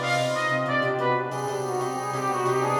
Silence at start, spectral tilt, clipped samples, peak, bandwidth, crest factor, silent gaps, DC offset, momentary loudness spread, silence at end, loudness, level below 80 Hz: 0 s; -4.5 dB/octave; under 0.1%; -12 dBFS; 18 kHz; 14 dB; none; under 0.1%; 4 LU; 0 s; -25 LUFS; -68 dBFS